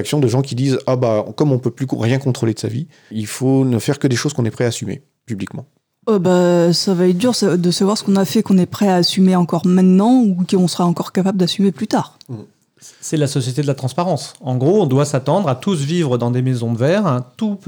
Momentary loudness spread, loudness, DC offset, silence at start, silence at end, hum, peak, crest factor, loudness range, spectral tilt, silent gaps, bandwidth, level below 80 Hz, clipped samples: 12 LU; -16 LUFS; under 0.1%; 0 s; 0.1 s; none; -4 dBFS; 12 dB; 5 LU; -6 dB/octave; none; over 20 kHz; -66 dBFS; under 0.1%